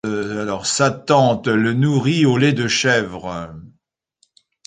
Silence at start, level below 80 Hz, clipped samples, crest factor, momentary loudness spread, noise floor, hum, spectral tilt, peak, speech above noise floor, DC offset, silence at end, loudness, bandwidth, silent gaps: 0.05 s; -52 dBFS; under 0.1%; 18 dB; 13 LU; -64 dBFS; none; -5 dB/octave; -2 dBFS; 47 dB; under 0.1%; 1 s; -17 LUFS; 9.6 kHz; none